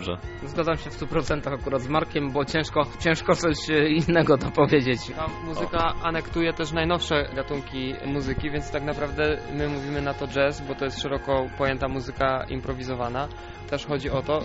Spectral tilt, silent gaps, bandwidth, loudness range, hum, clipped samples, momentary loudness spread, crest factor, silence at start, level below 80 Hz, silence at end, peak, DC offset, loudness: -4.5 dB/octave; none; 8 kHz; 5 LU; none; under 0.1%; 10 LU; 18 dB; 0 s; -40 dBFS; 0 s; -6 dBFS; under 0.1%; -26 LUFS